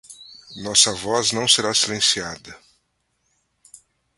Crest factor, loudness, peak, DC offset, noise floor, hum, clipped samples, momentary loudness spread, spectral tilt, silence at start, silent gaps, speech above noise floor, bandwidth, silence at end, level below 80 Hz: 22 dB; -17 LUFS; 0 dBFS; under 0.1%; -71 dBFS; none; under 0.1%; 23 LU; -1 dB/octave; 0.1 s; none; 50 dB; 12 kHz; 1.6 s; -58 dBFS